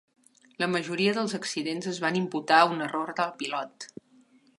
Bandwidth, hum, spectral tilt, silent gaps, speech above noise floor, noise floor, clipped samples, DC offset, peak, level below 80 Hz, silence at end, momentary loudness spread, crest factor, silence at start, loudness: 11.5 kHz; none; -4 dB/octave; none; 33 dB; -60 dBFS; under 0.1%; under 0.1%; -6 dBFS; -80 dBFS; 0.75 s; 12 LU; 22 dB; 0.6 s; -27 LUFS